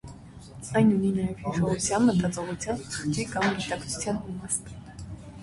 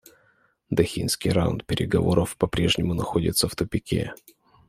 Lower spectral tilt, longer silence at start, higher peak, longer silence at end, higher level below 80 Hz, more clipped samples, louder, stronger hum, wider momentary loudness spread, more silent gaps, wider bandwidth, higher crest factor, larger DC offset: about the same, -5 dB/octave vs -5 dB/octave; second, 0.05 s vs 0.7 s; second, -12 dBFS vs -4 dBFS; second, 0 s vs 0.55 s; second, -50 dBFS vs -44 dBFS; neither; second, -27 LUFS vs -24 LUFS; neither; first, 19 LU vs 6 LU; neither; second, 11.5 kHz vs 16 kHz; about the same, 16 dB vs 20 dB; neither